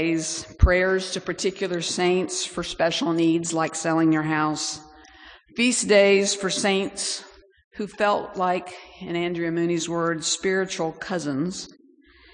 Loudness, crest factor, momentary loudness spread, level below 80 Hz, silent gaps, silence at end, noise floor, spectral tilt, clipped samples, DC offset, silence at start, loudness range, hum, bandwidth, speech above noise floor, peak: -23 LUFS; 20 dB; 11 LU; -36 dBFS; 7.64-7.71 s; 0.65 s; -55 dBFS; -4 dB/octave; under 0.1%; under 0.1%; 0 s; 4 LU; none; 10.5 kHz; 31 dB; -4 dBFS